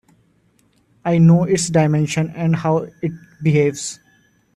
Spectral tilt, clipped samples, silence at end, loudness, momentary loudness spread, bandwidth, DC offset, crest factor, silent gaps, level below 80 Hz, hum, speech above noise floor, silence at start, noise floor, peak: -6.5 dB/octave; under 0.1%; 0.6 s; -18 LUFS; 15 LU; 11 kHz; under 0.1%; 14 dB; none; -54 dBFS; none; 43 dB; 1.05 s; -59 dBFS; -4 dBFS